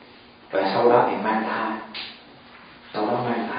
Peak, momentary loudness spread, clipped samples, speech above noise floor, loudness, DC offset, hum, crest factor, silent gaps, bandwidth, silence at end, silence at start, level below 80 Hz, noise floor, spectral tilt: -4 dBFS; 16 LU; under 0.1%; 28 dB; -23 LUFS; under 0.1%; none; 22 dB; none; 5.2 kHz; 0 s; 0 s; -66 dBFS; -48 dBFS; -10 dB/octave